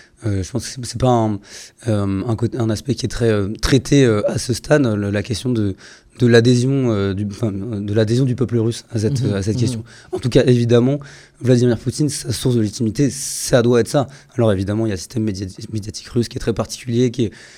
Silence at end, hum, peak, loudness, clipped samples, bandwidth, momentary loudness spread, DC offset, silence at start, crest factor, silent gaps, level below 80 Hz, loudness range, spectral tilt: 0.1 s; none; 0 dBFS; -18 LUFS; under 0.1%; 15.5 kHz; 11 LU; under 0.1%; 0.2 s; 18 dB; none; -40 dBFS; 3 LU; -6 dB/octave